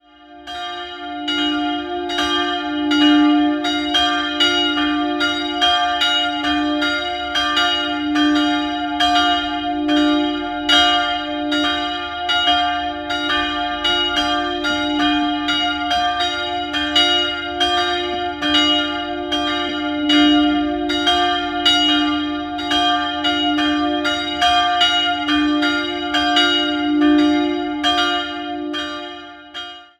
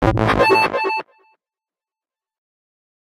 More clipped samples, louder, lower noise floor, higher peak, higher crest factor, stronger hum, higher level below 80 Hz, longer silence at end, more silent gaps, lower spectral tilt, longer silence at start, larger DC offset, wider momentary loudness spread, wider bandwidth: neither; about the same, -17 LUFS vs -16 LUFS; second, -39 dBFS vs under -90 dBFS; about the same, -2 dBFS vs 0 dBFS; about the same, 16 dB vs 20 dB; neither; second, -44 dBFS vs -38 dBFS; second, 0.15 s vs 2 s; neither; second, -2.5 dB/octave vs -6 dB/octave; first, 0.3 s vs 0 s; neither; about the same, 9 LU vs 9 LU; second, 12.5 kHz vs 15 kHz